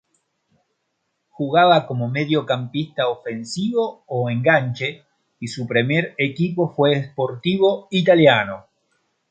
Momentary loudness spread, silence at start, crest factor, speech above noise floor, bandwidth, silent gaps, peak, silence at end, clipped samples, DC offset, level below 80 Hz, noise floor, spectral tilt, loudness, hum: 13 LU; 1.4 s; 20 dB; 54 dB; 9.2 kHz; none; -2 dBFS; 0.7 s; under 0.1%; under 0.1%; -64 dBFS; -73 dBFS; -6.5 dB/octave; -19 LUFS; none